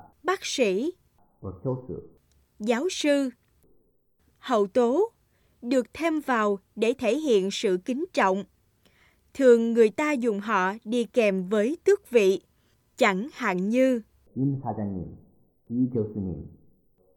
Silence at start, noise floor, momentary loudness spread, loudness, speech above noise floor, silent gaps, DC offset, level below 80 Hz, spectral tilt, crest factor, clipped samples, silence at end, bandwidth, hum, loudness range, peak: 0.25 s; -66 dBFS; 13 LU; -25 LUFS; 42 dB; none; under 0.1%; -62 dBFS; -5.5 dB/octave; 20 dB; under 0.1%; 0.7 s; 15.5 kHz; none; 6 LU; -6 dBFS